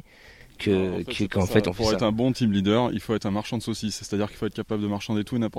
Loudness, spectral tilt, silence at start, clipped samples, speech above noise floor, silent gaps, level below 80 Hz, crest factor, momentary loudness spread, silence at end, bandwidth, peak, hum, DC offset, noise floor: -25 LUFS; -6 dB/octave; 0.25 s; under 0.1%; 25 dB; none; -48 dBFS; 20 dB; 7 LU; 0 s; 16 kHz; -6 dBFS; none; under 0.1%; -50 dBFS